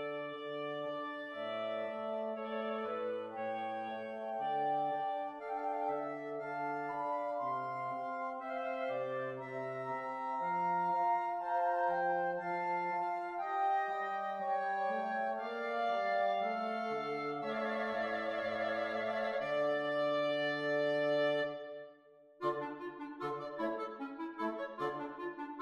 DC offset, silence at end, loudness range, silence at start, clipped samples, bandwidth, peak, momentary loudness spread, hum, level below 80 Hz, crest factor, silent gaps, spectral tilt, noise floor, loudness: under 0.1%; 0 s; 5 LU; 0 s; under 0.1%; 9.4 kHz; -22 dBFS; 8 LU; none; -80 dBFS; 14 dB; none; -6 dB/octave; -62 dBFS; -37 LUFS